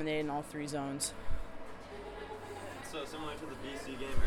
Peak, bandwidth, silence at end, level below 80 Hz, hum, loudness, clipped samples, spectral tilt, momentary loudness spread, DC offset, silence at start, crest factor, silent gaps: -18 dBFS; 14 kHz; 0 s; -46 dBFS; none; -41 LUFS; under 0.1%; -4 dB/octave; 11 LU; under 0.1%; 0 s; 18 dB; none